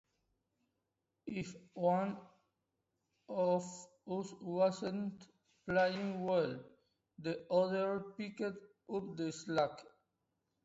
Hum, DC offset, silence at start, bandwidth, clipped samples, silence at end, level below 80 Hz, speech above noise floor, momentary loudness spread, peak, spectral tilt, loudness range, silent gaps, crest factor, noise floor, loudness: none; under 0.1%; 1.25 s; 8 kHz; under 0.1%; 0.8 s; -76 dBFS; 50 dB; 16 LU; -20 dBFS; -5 dB/octave; 3 LU; none; 20 dB; -87 dBFS; -38 LUFS